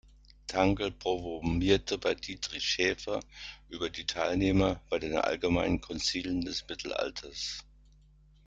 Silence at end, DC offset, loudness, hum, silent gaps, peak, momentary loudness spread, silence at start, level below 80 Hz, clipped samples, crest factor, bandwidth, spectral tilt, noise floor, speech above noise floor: 0.85 s; under 0.1%; -31 LUFS; none; none; -12 dBFS; 10 LU; 0.5 s; -48 dBFS; under 0.1%; 20 dB; 9.2 kHz; -4.5 dB/octave; -60 dBFS; 29 dB